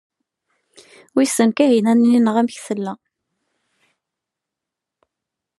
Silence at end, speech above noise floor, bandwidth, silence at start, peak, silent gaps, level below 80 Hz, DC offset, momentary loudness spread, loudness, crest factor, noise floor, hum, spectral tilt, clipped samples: 2.65 s; 68 dB; 12.5 kHz; 1.15 s; -2 dBFS; none; -78 dBFS; under 0.1%; 12 LU; -17 LUFS; 18 dB; -84 dBFS; none; -5 dB/octave; under 0.1%